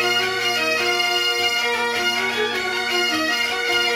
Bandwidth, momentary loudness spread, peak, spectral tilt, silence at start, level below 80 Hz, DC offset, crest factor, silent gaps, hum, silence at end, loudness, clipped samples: 16 kHz; 3 LU; -6 dBFS; -1 dB/octave; 0 s; -60 dBFS; under 0.1%; 14 dB; none; none; 0 s; -19 LUFS; under 0.1%